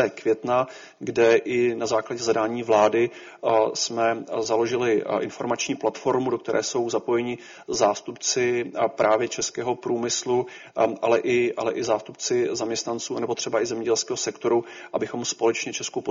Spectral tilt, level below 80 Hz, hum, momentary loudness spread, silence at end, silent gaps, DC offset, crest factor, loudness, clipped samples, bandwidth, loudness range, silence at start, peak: -3.5 dB/octave; -66 dBFS; none; 7 LU; 0 s; none; under 0.1%; 18 dB; -24 LUFS; under 0.1%; 7.6 kHz; 3 LU; 0 s; -6 dBFS